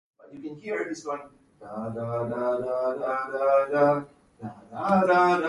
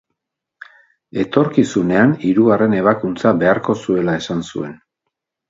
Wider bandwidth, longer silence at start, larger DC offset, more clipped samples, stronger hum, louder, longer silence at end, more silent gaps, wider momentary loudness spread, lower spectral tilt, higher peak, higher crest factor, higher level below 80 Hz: first, 11 kHz vs 7.8 kHz; second, 0.3 s vs 1.15 s; neither; neither; neither; second, -26 LUFS vs -16 LUFS; second, 0 s vs 0.75 s; neither; first, 20 LU vs 10 LU; about the same, -7 dB/octave vs -7 dB/octave; second, -8 dBFS vs 0 dBFS; about the same, 18 dB vs 16 dB; second, -66 dBFS vs -52 dBFS